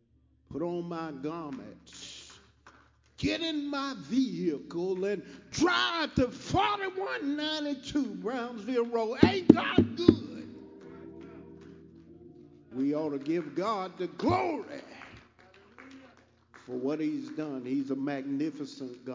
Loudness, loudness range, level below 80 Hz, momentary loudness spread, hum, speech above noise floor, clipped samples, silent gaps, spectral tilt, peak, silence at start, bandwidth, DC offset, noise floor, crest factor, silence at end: -30 LUFS; 10 LU; -56 dBFS; 22 LU; none; 36 dB; under 0.1%; none; -5.5 dB/octave; 0 dBFS; 0.5 s; 7.6 kHz; under 0.1%; -66 dBFS; 32 dB; 0 s